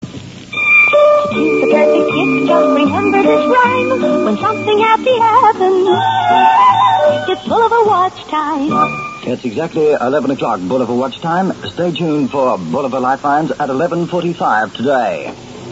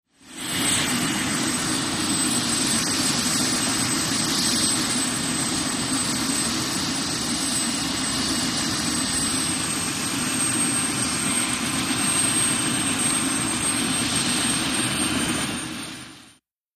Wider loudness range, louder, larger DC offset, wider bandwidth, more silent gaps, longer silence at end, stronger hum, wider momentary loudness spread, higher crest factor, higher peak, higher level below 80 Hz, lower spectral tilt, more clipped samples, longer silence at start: first, 5 LU vs 2 LU; first, -13 LUFS vs -21 LUFS; neither; second, 8 kHz vs 15.5 kHz; neither; second, 0 s vs 0.45 s; neither; first, 9 LU vs 4 LU; about the same, 12 dB vs 14 dB; first, 0 dBFS vs -10 dBFS; about the same, -52 dBFS vs -50 dBFS; first, -6 dB/octave vs -2 dB/octave; neither; second, 0 s vs 0.25 s